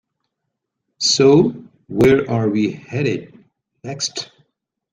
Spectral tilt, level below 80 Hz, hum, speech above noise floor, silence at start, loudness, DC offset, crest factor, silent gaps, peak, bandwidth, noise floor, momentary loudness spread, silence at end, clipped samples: -4.5 dB/octave; -48 dBFS; none; 61 dB; 1 s; -17 LUFS; under 0.1%; 18 dB; none; -2 dBFS; 12 kHz; -78 dBFS; 20 LU; 0.7 s; under 0.1%